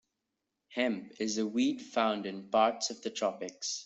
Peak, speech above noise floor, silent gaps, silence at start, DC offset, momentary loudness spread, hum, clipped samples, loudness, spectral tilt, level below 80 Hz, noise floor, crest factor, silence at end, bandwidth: -12 dBFS; 53 dB; none; 0.7 s; under 0.1%; 8 LU; none; under 0.1%; -32 LUFS; -3 dB/octave; -76 dBFS; -86 dBFS; 20 dB; 0 s; 8.2 kHz